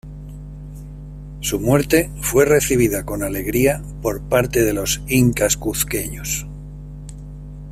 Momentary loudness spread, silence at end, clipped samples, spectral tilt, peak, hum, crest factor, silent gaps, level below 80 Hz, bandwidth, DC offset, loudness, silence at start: 20 LU; 0 s; under 0.1%; -4.5 dB/octave; -2 dBFS; 50 Hz at -30 dBFS; 18 dB; none; -34 dBFS; 16 kHz; under 0.1%; -18 LUFS; 0.05 s